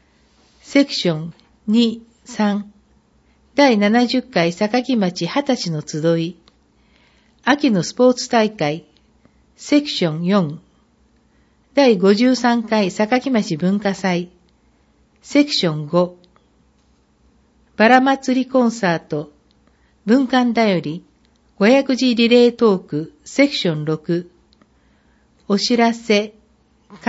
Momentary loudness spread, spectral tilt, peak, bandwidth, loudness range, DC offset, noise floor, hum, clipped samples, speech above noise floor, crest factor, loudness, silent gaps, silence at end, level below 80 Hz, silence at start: 13 LU; -5.5 dB/octave; 0 dBFS; 8 kHz; 5 LU; under 0.1%; -58 dBFS; none; under 0.1%; 41 dB; 18 dB; -17 LUFS; none; 0 s; -60 dBFS; 0.7 s